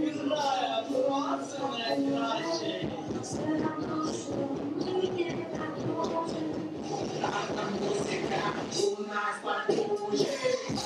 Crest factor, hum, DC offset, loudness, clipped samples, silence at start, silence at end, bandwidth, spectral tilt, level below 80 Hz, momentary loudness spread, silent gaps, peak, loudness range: 16 dB; none; under 0.1%; -31 LUFS; under 0.1%; 0 s; 0 s; 13 kHz; -4.5 dB/octave; -66 dBFS; 5 LU; none; -14 dBFS; 2 LU